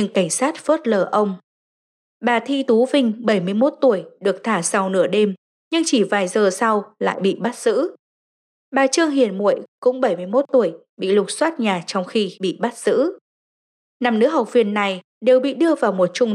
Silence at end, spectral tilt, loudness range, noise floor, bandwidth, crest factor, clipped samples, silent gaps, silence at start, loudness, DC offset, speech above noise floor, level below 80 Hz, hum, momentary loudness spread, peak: 0 s; -4.5 dB/octave; 2 LU; under -90 dBFS; 13 kHz; 14 dB; under 0.1%; 1.43-2.20 s, 5.38-5.71 s, 7.99-8.72 s, 9.68-9.82 s, 10.89-10.97 s, 13.21-14.00 s, 15.04-15.21 s; 0 s; -19 LUFS; under 0.1%; over 72 dB; -86 dBFS; none; 7 LU; -6 dBFS